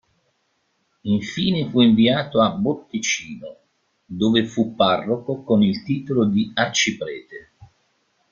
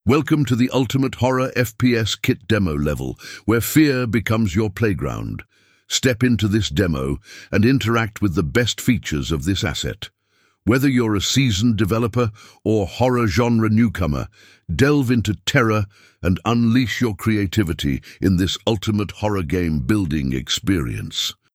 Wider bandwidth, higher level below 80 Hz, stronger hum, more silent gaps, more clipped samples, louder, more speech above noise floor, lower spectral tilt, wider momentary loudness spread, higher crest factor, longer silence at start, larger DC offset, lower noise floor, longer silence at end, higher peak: second, 7.4 kHz vs 16.5 kHz; second, -56 dBFS vs -38 dBFS; neither; neither; neither; about the same, -20 LUFS vs -20 LUFS; first, 49 dB vs 44 dB; about the same, -4.5 dB/octave vs -5.5 dB/octave; first, 18 LU vs 8 LU; about the same, 18 dB vs 16 dB; first, 1.05 s vs 0.05 s; neither; first, -69 dBFS vs -63 dBFS; first, 0.65 s vs 0.2 s; about the same, -2 dBFS vs -4 dBFS